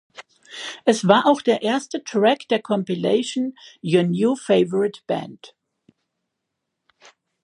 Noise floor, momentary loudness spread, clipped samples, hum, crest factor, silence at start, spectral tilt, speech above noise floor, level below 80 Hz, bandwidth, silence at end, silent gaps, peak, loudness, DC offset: -80 dBFS; 13 LU; under 0.1%; none; 22 dB; 0.2 s; -5.5 dB/octave; 60 dB; -72 dBFS; 11.5 kHz; 1.95 s; none; 0 dBFS; -20 LUFS; under 0.1%